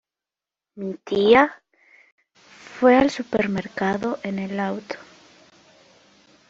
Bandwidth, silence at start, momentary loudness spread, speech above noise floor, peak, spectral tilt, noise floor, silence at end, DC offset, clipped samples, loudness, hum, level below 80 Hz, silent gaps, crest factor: 7.8 kHz; 0.75 s; 17 LU; 69 dB; -2 dBFS; -6 dB/octave; -89 dBFS; 1.55 s; under 0.1%; under 0.1%; -21 LUFS; none; -58 dBFS; 2.12-2.18 s; 20 dB